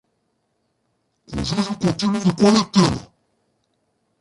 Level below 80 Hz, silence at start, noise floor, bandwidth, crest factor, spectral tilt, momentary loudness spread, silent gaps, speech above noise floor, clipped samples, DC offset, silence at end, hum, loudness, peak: -46 dBFS; 1.3 s; -70 dBFS; 11.5 kHz; 20 dB; -5.5 dB/octave; 13 LU; none; 52 dB; under 0.1%; under 0.1%; 1.15 s; none; -19 LUFS; -2 dBFS